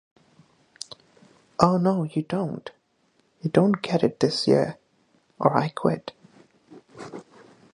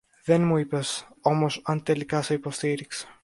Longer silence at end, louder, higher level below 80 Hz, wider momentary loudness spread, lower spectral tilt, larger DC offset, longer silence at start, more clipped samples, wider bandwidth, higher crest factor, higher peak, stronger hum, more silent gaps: first, 0.55 s vs 0.1 s; about the same, -24 LUFS vs -26 LUFS; about the same, -60 dBFS vs -64 dBFS; first, 20 LU vs 7 LU; about the same, -6.5 dB/octave vs -5.5 dB/octave; neither; first, 1.6 s vs 0.25 s; neither; about the same, 11 kHz vs 11.5 kHz; first, 26 dB vs 20 dB; first, 0 dBFS vs -6 dBFS; neither; neither